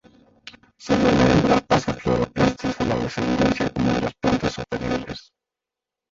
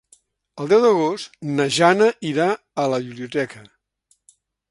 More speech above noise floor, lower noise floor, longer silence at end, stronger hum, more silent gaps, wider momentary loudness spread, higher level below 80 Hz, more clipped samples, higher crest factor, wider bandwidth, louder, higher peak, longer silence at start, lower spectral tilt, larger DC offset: first, 68 dB vs 46 dB; first, -87 dBFS vs -65 dBFS; second, 0.9 s vs 1.1 s; neither; neither; about the same, 11 LU vs 12 LU; first, -40 dBFS vs -66 dBFS; neither; about the same, 18 dB vs 20 dB; second, 7.8 kHz vs 11.5 kHz; about the same, -21 LUFS vs -20 LUFS; second, -4 dBFS vs 0 dBFS; about the same, 0.45 s vs 0.55 s; about the same, -6 dB/octave vs -5 dB/octave; neither